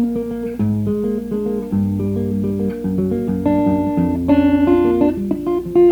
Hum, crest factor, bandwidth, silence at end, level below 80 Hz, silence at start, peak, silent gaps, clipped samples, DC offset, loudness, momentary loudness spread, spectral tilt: none; 14 dB; 19.5 kHz; 0 s; -40 dBFS; 0 s; -2 dBFS; none; under 0.1%; under 0.1%; -18 LUFS; 7 LU; -9.5 dB/octave